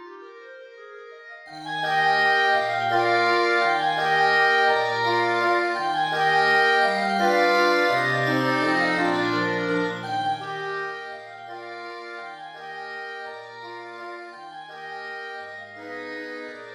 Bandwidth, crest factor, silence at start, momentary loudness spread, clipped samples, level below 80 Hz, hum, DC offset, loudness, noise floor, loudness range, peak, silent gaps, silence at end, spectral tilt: 13.5 kHz; 16 dB; 0 s; 20 LU; under 0.1%; -74 dBFS; none; under 0.1%; -21 LUFS; -43 dBFS; 16 LU; -8 dBFS; none; 0 s; -4.5 dB/octave